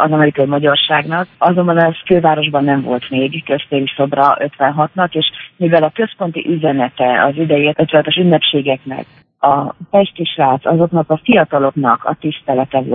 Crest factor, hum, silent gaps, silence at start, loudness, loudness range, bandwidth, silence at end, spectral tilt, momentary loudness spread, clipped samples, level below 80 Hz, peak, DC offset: 12 dB; none; none; 0 s; -14 LUFS; 2 LU; 4.4 kHz; 0 s; -9.5 dB/octave; 6 LU; under 0.1%; -56 dBFS; 0 dBFS; under 0.1%